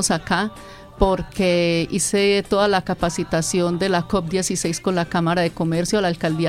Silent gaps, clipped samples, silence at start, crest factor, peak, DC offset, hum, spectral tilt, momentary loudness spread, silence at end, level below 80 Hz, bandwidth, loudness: none; under 0.1%; 0 s; 18 dB; -2 dBFS; under 0.1%; none; -4.5 dB/octave; 4 LU; 0 s; -38 dBFS; 15.5 kHz; -20 LUFS